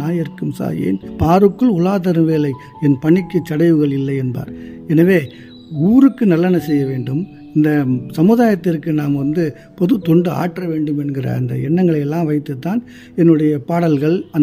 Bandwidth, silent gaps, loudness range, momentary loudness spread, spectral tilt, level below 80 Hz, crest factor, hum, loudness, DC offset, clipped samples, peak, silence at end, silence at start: 16 kHz; none; 3 LU; 10 LU; -9 dB/octave; -46 dBFS; 14 dB; none; -16 LUFS; under 0.1%; under 0.1%; 0 dBFS; 0 s; 0 s